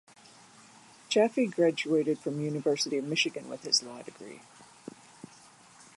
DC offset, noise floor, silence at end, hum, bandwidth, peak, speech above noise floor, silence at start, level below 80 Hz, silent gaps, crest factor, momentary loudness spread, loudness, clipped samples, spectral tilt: under 0.1%; -56 dBFS; 1.35 s; none; 11.5 kHz; -12 dBFS; 27 dB; 1.1 s; -80 dBFS; none; 20 dB; 23 LU; -29 LUFS; under 0.1%; -3.5 dB/octave